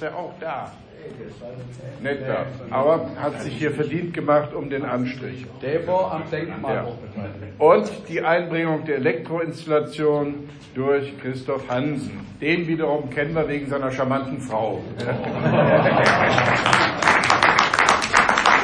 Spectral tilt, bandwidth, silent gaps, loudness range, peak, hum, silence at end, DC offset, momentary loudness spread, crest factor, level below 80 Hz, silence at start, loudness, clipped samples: -5 dB/octave; 10.5 kHz; none; 8 LU; 0 dBFS; none; 0 s; under 0.1%; 17 LU; 22 dB; -52 dBFS; 0 s; -21 LUFS; under 0.1%